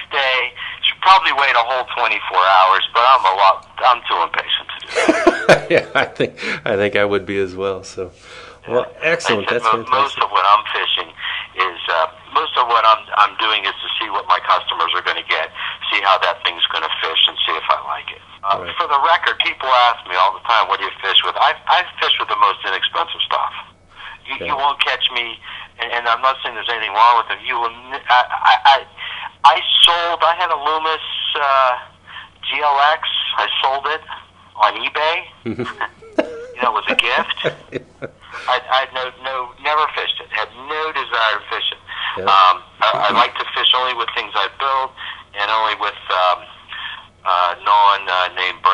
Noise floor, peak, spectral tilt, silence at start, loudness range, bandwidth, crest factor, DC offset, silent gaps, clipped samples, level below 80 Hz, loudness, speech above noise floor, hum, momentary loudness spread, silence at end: -38 dBFS; 0 dBFS; -3 dB/octave; 0 s; 6 LU; 12 kHz; 18 dB; under 0.1%; none; under 0.1%; -56 dBFS; -16 LUFS; 21 dB; none; 13 LU; 0 s